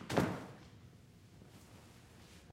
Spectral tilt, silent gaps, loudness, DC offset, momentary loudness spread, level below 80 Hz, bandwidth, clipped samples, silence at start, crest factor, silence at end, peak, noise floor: -6 dB/octave; none; -39 LUFS; under 0.1%; 24 LU; -66 dBFS; 16 kHz; under 0.1%; 0 s; 30 dB; 0 s; -14 dBFS; -60 dBFS